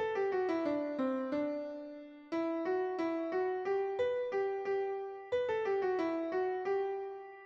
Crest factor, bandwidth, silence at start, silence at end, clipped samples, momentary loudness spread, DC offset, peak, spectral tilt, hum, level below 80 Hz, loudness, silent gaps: 12 dB; 6.8 kHz; 0 s; 0 s; under 0.1%; 7 LU; under 0.1%; -24 dBFS; -6 dB/octave; none; -76 dBFS; -35 LUFS; none